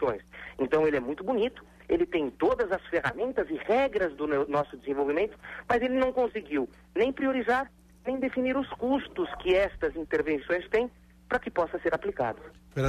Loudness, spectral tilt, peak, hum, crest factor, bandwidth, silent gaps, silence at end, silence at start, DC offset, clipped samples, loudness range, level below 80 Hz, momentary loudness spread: -29 LUFS; -6.5 dB/octave; -14 dBFS; none; 14 dB; 12.5 kHz; none; 0 s; 0 s; under 0.1%; under 0.1%; 1 LU; -54 dBFS; 7 LU